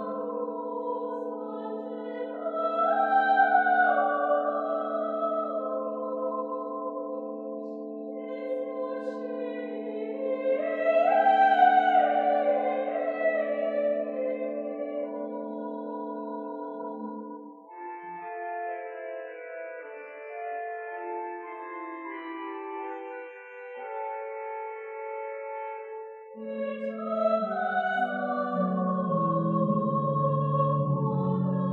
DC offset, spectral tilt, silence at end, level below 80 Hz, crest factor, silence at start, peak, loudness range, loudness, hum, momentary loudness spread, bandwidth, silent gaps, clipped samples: under 0.1%; -9.5 dB/octave; 0 s; -86 dBFS; 20 dB; 0 s; -8 dBFS; 14 LU; -29 LUFS; none; 16 LU; 4.6 kHz; none; under 0.1%